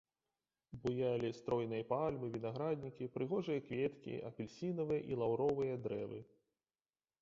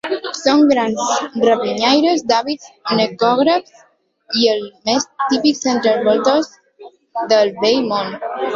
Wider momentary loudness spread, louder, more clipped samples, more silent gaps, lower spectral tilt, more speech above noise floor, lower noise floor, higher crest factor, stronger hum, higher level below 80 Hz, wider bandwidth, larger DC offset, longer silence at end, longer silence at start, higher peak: about the same, 9 LU vs 9 LU; second, -40 LUFS vs -16 LUFS; neither; neither; first, -7 dB/octave vs -3.5 dB/octave; first, over 50 dB vs 26 dB; first, under -90 dBFS vs -42 dBFS; about the same, 18 dB vs 14 dB; neither; second, -72 dBFS vs -60 dBFS; about the same, 7.4 kHz vs 7.8 kHz; neither; first, 0.95 s vs 0 s; first, 0.7 s vs 0.05 s; second, -24 dBFS vs -2 dBFS